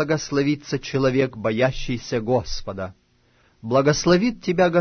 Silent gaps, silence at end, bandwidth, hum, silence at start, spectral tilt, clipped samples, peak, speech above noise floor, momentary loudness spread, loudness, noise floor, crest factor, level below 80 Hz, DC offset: none; 0 s; 6.6 kHz; none; 0 s; -5.5 dB/octave; under 0.1%; -6 dBFS; 39 dB; 13 LU; -22 LUFS; -60 dBFS; 16 dB; -40 dBFS; under 0.1%